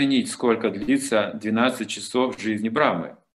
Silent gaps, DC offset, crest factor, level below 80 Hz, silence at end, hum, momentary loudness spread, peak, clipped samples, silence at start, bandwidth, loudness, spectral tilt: none; under 0.1%; 20 dB; -62 dBFS; 0.25 s; none; 5 LU; -4 dBFS; under 0.1%; 0 s; 12.5 kHz; -23 LUFS; -4.5 dB/octave